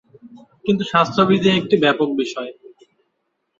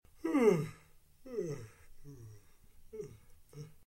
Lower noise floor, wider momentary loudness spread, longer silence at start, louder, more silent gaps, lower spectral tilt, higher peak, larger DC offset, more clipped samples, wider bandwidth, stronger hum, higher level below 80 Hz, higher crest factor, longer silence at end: first, -72 dBFS vs -61 dBFS; second, 12 LU vs 27 LU; about the same, 0.25 s vs 0.25 s; first, -17 LUFS vs -34 LUFS; neither; about the same, -6 dB/octave vs -7 dB/octave; first, -2 dBFS vs -16 dBFS; neither; neither; second, 7.6 kHz vs 16.5 kHz; neither; about the same, -58 dBFS vs -62 dBFS; about the same, 18 dB vs 22 dB; first, 1.1 s vs 0.2 s